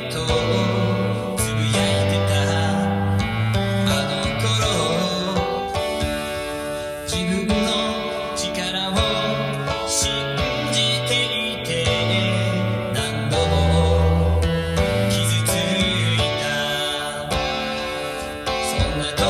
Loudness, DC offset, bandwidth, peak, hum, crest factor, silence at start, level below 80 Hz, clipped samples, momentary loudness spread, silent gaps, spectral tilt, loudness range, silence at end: -21 LUFS; under 0.1%; 15 kHz; -6 dBFS; none; 16 dB; 0 s; -36 dBFS; under 0.1%; 6 LU; none; -4.5 dB/octave; 3 LU; 0 s